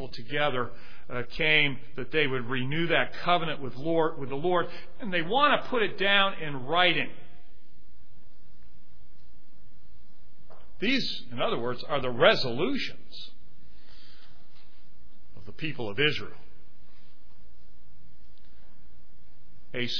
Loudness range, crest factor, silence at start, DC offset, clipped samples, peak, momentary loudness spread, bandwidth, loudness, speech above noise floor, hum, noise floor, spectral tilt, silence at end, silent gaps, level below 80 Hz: 9 LU; 26 dB; 0 s; 4%; under 0.1%; -6 dBFS; 15 LU; 5.4 kHz; -27 LUFS; 30 dB; none; -58 dBFS; -5.5 dB/octave; 0 s; none; -56 dBFS